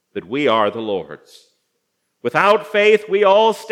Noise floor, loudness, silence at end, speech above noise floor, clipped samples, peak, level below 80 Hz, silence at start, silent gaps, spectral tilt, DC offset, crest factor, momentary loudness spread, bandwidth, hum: -71 dBFS; -16 LUFS; 0 s; 55 dB; under 0.1%; 0 dBFS; -74 dBFS; 0.15 s; none; -4.5 dB/octave; under 0.1%; 18 dB; 13 LU; 14 kHz; none